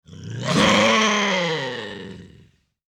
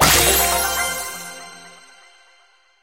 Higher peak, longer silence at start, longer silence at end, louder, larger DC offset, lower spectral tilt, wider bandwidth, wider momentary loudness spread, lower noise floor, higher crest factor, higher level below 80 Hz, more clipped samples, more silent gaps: second, -6 dBFS vs 0 dBFS; about the same, 0.1 s vs 0 s; second, 0.6 s vs 1.15 s; second, -19 LUFS vs -16 LUFS; second, under 0.1% vs 0.2%; first, -3.5 dB/octave vs -1.5 dB/octave; first, over 20 kHz vs 16 kHz; second, 20 LU vs 23 LU; about the same, -55 dBFS vs -56 dBFS; about the same, 16 dB vs 20 dB; second, -52 dBFS vs -36 dBFS; neither; neither